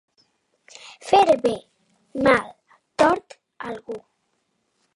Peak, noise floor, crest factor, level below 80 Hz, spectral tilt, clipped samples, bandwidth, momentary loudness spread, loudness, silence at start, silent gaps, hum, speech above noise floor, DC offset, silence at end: -2 dBFS; -72 dBFS; 22 dB; -58 dBFS; -4.5 dB/octave; under 0.1%; 11.5 kHz; 21 LU; -20 LUFS; 0.85 s; none; none; 52 dB; under 0.1%; 0.95 s